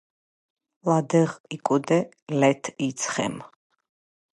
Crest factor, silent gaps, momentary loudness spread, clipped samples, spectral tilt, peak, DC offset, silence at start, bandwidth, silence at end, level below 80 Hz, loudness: 20 dB; 1.40-1.44 s, 2.22-2.27 s; 9 LU; under 0.1%; -5.5 dB/octave; -6 dBFS; under 0.1%; 0.85 s; 11.5 kHz; 0.9 s; -70 dBFS; -25 LUFS